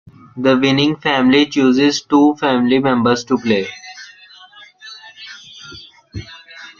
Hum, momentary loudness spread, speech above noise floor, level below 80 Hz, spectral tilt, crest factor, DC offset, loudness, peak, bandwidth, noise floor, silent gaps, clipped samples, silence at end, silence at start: none; 22 LU; 29 dB; -52 dBFS; -5 dB/octave; 16 dB; under 0.1%; -14 LUFS; -2 dBFS; 7.2 kHz; -42 dBFS; none; under 0.1%; 0.1 s; 0.35 s